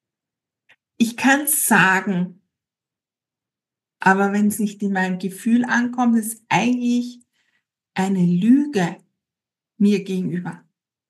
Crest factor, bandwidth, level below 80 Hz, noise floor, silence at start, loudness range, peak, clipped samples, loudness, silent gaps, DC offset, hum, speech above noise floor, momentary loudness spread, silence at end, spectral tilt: 20 dB; 12.5 kHz; -76 dBFS; -89 dBFS; 1 s; 2 LU; -2 dBFS; under 0.1%; -19 LUFS; none; under 0.1%; none; 70 dB; 10 LU; 0.55 s; -4.5 dB/octave